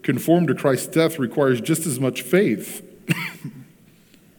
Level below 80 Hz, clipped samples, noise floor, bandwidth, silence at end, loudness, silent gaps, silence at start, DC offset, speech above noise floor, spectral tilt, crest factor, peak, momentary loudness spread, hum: -68 dBFS; under 0.1%; -52 dBFS; 19 kHz; 0.75 s; -21 LUFS; none; 0.05 s; under 0.1%; 32 dB; -5.5 dB/octave; 18 dB; -4 dBFS; 14 LU; none